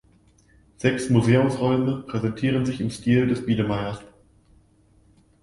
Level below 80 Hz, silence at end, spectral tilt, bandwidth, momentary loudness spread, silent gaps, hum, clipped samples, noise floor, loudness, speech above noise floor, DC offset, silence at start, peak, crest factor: -52 dBFS; 1.35 s; -7 dB/octave; 11.5 kHz; 8 LU; none; none; under 0.1%; -58 dBFS; -23 LUFS; 36 dB; under 0.1%; 0.8 s; -6 dBFS; 18 dB